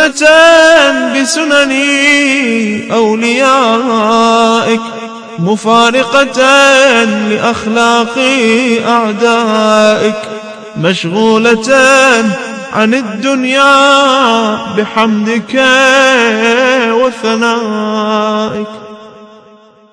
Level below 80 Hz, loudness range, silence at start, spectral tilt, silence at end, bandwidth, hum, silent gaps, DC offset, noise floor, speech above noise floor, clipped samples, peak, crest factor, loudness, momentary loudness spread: -50 dBFS; 2 LU; 0 s; -3.5 dB/octave; 0.65 s; 11 kHz; none; none; under 0.1%; -40 dBFS; 32 dB; 2%; 0 dBFS; 10 dB; -8 LUFS; 10 LU